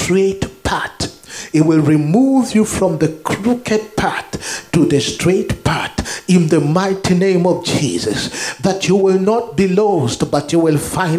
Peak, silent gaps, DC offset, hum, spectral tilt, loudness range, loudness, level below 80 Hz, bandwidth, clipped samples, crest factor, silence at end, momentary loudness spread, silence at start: 0 dBFS; none; under 0.1%; none; -5.5 dB/octave; 2 LU; -15 LUFS; -40 dBFS; 15.5 kHz; under 0.1%; 14 dB; 0 s; 8 LU; 0 s